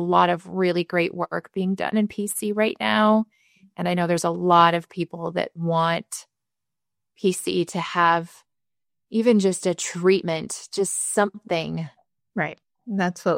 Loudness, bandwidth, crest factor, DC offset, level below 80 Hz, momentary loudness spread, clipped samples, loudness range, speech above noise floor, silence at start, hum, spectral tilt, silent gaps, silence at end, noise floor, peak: -23 LUFS; 16 kHz; 22 dB; under 0.1%; -66 dBFS; 11 LU; under 0.1%; 4 LU; over 68 dB; 0 s; none; -4.5 dB/octave; none; 0 s; under -90 dBFS; -2 dBFS